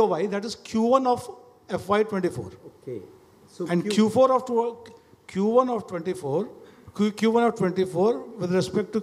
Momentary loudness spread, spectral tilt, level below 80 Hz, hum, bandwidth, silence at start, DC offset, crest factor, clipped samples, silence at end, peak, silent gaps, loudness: 17 LU; -6.5 dB/octave; -64 dBFS; none; 14 kHz; 0 s; under 0.1%; 20 dB; under 0.1%; 0 s; -6 dBFS; none; -24 LUFS